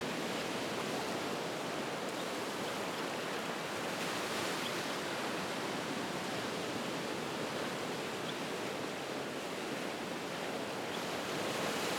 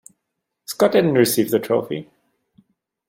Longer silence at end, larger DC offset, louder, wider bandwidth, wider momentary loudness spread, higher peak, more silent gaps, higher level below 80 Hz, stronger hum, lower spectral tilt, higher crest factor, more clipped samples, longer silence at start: second, 0 s vs 1.05 s; neither; second, -38 LUFS vs -18 LUFS; about the same, 18 kHz vs 16.5 kHz; second, 3 LU vs 16 LU; second, -24 dBFS vs -2 dBFS; neither; second, -76 dBFS vs -64 dBFS; neither; second, -3.5 dB/octave vs -5 dB/octave; about the same, 14 dB vs 18 dB; neither; second, 0 s vs 0.7 s